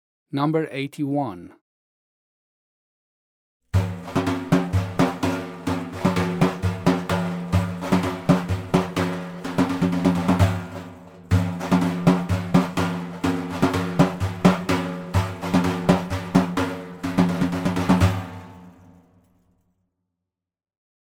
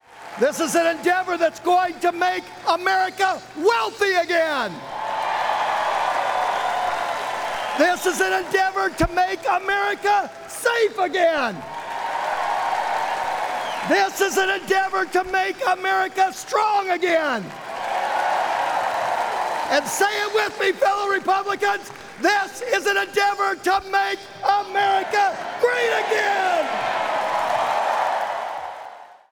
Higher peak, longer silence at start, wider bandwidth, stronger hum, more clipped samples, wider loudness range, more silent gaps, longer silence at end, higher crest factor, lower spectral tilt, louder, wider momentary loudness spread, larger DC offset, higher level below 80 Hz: about the same, -2 dBFS vs -4 dBFS; first, 0.35 s vs 0.1 s; second, 16 kHz vs over 20 kHz; neither; neither; first, 6 LU vs 2 LU; first, 1.61-3.60 s vs none; first, 2.4 s vs 0.2 s; first, 22 dB vs 16 dB; first, -7 dB/octave vs -2.5 dB/octave; about the same, -23 LUFS vs -21 LUFS; about the same, 8 LU vs 6 LU; neither; about the same, -48 dBFS vs -50 dBFS